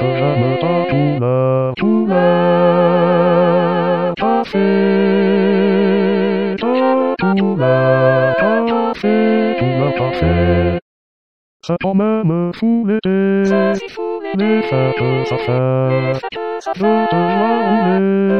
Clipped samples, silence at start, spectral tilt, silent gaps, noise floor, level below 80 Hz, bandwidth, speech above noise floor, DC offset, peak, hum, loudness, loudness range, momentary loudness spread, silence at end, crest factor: under 0.1%; 0 s; -8.5 dB/octave; 10.82-11.60 s; under -90 dBFS; -40 dBFS; 6.8 kHz; over 75 dB; 0.7%; 0 dBFS; none; -15 LUFS; 3 LU; 5 LU; 0 s; 14 dB